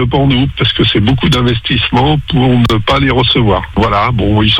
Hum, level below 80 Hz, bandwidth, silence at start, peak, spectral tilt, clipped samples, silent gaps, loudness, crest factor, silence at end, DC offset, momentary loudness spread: none; -24 dBFS; 11 kHz; 0 s; 0 dBFS; -6.5 dB/octave; under 0.1%; none; -11 LUFS; 10 dB; 0 s; under 0.1%; 3 LU